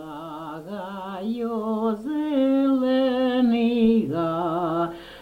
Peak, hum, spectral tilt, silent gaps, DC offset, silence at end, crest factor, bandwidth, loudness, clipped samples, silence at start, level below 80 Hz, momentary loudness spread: -10 dBFS; none; -7.5 dB/octave; none; under 0.1%; 0 s; 14 dB; 9 kHz; -23 LUFS; under 0.1%; 0 s; -56 dBFS; 14 LU